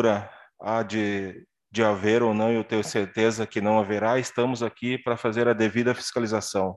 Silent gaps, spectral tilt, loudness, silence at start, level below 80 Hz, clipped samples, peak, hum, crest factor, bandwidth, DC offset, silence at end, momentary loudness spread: none; -5 dB/octave; -25 LUFS; 0 s; -60 dBFS; under 0.1%; -6 dBFS; none; 18 dB; 12.5 kHz; under 0.1%; 0 s; 7 LU